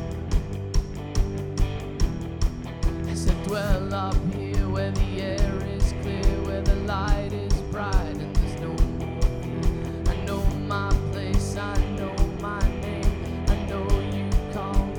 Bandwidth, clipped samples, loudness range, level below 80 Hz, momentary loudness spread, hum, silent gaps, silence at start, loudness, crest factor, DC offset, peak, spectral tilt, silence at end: 14 kHz; under 0.1%; 1 LU; -26 dBFS; 3 LU; none; none; 0 s; -27 LUFS; 16 dB; under 0.1%; -8 dBFS; -6.5 dB/octave; 0 s